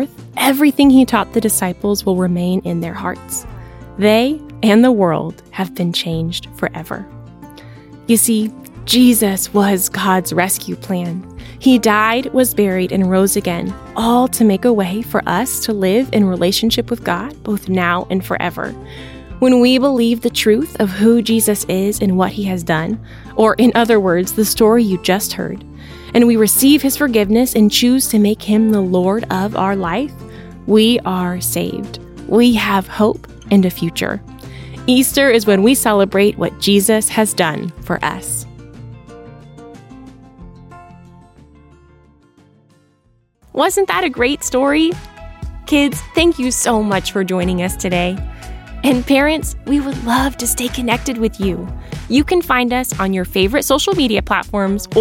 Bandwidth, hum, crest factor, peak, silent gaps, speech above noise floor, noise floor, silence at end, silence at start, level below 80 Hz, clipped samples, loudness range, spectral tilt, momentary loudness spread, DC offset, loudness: 17 kHz; none; 14 dB; 0 dBFS; none; 43 dB; -57 dBFS; 0 s; 0 s; -36 dBFS; under 0.1%; 5 LU; -4.5 dB/octave; 14 LU; under 0.1%; -15 LUFS